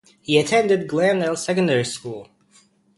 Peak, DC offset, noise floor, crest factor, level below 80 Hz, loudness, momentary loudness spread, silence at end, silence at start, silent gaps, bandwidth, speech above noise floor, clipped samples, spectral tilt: -2 dBFS; under 0.1%; -57 dBFS; 18 dB; -62 dBFS; -20 LUFS; 13 LU; 0.75 s; 0.3 s; none; 11.5 kHz; 37 dB; under 0.1%; -4.5 dB/octave